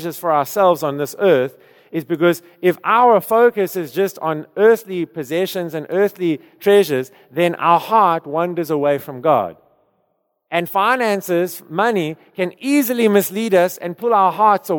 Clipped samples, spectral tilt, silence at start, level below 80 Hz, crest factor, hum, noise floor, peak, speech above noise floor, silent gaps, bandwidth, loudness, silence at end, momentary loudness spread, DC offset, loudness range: under 0.1%; -5.5 dB/octave; 0 s; -72 dBFS; 16 dB; none; -68 dBFS; -2 dBFS; 51 dB; none; 19.5 kHz; -17 LUFS; 0 s; 10 LU; under 0.1%; 3 LU